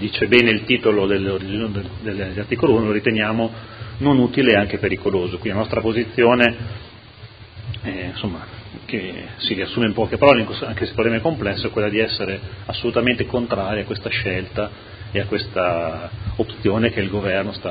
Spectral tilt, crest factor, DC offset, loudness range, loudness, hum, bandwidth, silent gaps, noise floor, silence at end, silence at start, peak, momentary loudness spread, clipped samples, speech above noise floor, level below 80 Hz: -8.5 dB/octave; 20 dB; under 0.1%; 5 LU; -20 LUFS; none; 8 kHz; none; -41 dBFS; 0 s; 0 s; 0 dBFS; 14 LU; under 0.1%; 21 dB; -40 dBFS